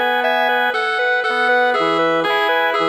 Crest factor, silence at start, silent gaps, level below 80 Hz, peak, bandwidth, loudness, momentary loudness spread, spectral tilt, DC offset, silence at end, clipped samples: 12 dB; 0 s; none; -70 dBFS; -4 dBFS; 19 kHz; -16 LUFS; 2 LU; -3.5 dB/octave; under 0.1%; 0 s; under 0.1%